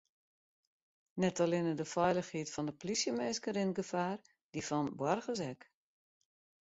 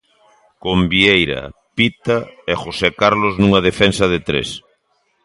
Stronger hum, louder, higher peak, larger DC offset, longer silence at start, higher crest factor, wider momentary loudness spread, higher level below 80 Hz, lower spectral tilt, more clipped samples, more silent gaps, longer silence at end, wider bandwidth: neither; second, -36 LUFS vs -16 LUFS; second, -20 dBFS vs 0 dBFS; neither; first, 1.15 s vs 0.65 s; about the same, 18 dB vs 18 dB; about the same, 11 LU vs 13 LU; second, -74 dBFS vs -38 dBFS; about the same, -5 dB/octave vs -5 dB/octave; neither; first, 4.43-4.53 s vs none; first, 1.1 s vs 0.65 s; second, 8 kHz vs 11.5 kHz